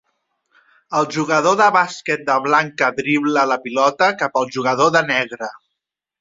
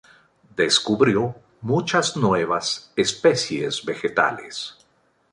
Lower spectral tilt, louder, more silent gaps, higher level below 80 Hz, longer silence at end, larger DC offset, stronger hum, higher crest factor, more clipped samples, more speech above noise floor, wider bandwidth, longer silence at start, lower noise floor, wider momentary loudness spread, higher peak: about the same, -4 dB/octave vs -4 dB/octave; first, -17 LUFS vs -21 LUFS; neither; about the same, -64 dBFS vs -60 dBFS; about the same, 0.65 s vs 0.6 s; neither; neither; about the same, 16 dB vs 20 dB; neither; first, 63 dB vs 42 dB; second, 7.8 kHz vs 11.5 kHz; first, 0.9 s vs 0.6 s; first, -80 dBFS vs -63 dBFS; second, 7 LU vs 13 LU; about the same, -2 dBFS vs -4 dBFS